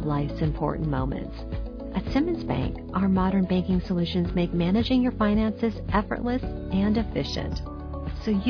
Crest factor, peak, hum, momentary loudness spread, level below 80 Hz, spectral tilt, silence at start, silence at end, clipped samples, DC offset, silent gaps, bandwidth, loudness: 16 dB; -10 dBFS; none; 11 LU; -36 dBFS; -8 dB/octave; 0 s; 0 s; under 0.1%; under 0.1%; none; 5.4 kHz; -26 LUFS